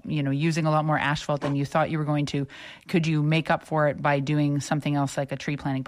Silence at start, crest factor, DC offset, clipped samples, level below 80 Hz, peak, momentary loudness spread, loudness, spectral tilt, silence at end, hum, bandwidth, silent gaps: 0.05 s; 14 dB; under 0.1%; under 0.1%; -58 dBFS; -10 dBFS; 6 LU; -25 LUFS; -6.5 dB/octave; 0 s; none; 11.5 kHz; none